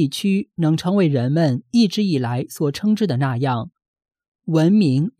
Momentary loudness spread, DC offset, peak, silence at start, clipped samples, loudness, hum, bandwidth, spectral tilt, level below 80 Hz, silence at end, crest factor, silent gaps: 7 LU; under 0.1%; -6 dBFS; 0 s; under 0.1%; -19 LUFS; none; 15 kHz; -7 dB/octave; -62 dBFS; 0.1 s; 14 dB; 3.88-3.94 s, 4.28-4.32 s